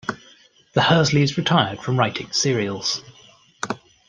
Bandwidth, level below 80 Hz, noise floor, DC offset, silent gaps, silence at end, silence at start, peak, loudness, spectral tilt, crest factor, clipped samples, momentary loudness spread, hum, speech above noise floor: 9.8 kHz; -56 dBFS; -53 dBFS; under 0.1%; none; 0.35 s; 0.05 s; -2 dBFS; -20 LUFS; -4.5 dB/octave; 20 dB; under 0.1%; 14 LU; none; 33 dB